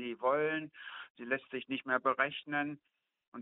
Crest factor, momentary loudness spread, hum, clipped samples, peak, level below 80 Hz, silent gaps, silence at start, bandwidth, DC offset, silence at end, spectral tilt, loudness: 22 dB; 15 LU; none; under 0.1%; -14 dBFS; -82 dBFS; 1.10-1.15 s, 3.28-3.32 s; 0 s; 4 kHz; under 0.1%; 0 s; -2 dB/octave; -35 LUFS